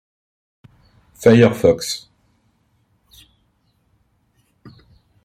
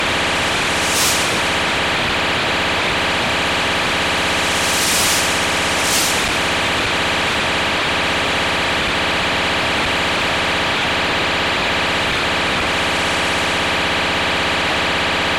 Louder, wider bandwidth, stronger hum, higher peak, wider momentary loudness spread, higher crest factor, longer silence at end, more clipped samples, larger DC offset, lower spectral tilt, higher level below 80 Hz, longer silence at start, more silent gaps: about the same, -15 LUFS vs -16 LUFS; about the same, 15.5 kHz vs 16.5 kHz; neither; first, 0 dBFS vs -4 dBFS; first, 14 LU vs 2 LU; first, 20 dB vs 12 dB; first, 3.25 s vs 0 s; neither; neither; first, -6 dB/octave vs -2 dB/octave; second, -54 dBFS vs -38 dBFS; first, 1.2 s vs 0 s; neither